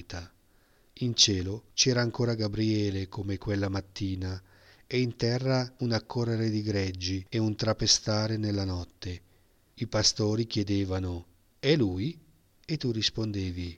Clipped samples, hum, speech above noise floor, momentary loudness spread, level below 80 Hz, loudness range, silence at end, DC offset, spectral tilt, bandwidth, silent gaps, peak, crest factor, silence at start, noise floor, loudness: under 0.1%; none; 35 dB; 13 LU; -52 dBFS; 4 LU; 0 s; under 0.1%; -4.5 dB/octave; 10 kHz; none; -6 dBFS; 24 dB; 0 s; -64 dBFS; -29 LUFS